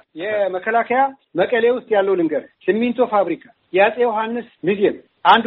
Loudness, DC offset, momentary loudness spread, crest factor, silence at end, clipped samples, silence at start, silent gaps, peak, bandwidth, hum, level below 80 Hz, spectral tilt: -19 LUFS; under 0.1%; 7 LU; 18 dB; 0 s; under 0.1%; 0.15 s; none; 0 dBFS; 5 kHz; none; -64 dBFS; -2.5 dB/octave